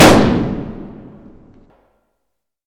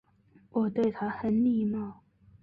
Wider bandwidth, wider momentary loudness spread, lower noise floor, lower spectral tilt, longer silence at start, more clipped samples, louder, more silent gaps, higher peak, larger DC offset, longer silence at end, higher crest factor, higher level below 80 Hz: first, 19 kHz vs 4.9 kHz; first, 25 LU vs 9 LU; first, -75 dBFS vs -62 dBFS; second, -5 dB/octave vs -9.5 dB/octave; second, 0 s vs 0.55 s; neither; first, -14 LUFS vs -29 LUFS; neither; first, 0 dBFS vs -16 dBFS; neither; first, 1.75 s vs 0.5 s; about the same, 16 dB vs 14 dB; first, -34 dBFS vs -64 dBFS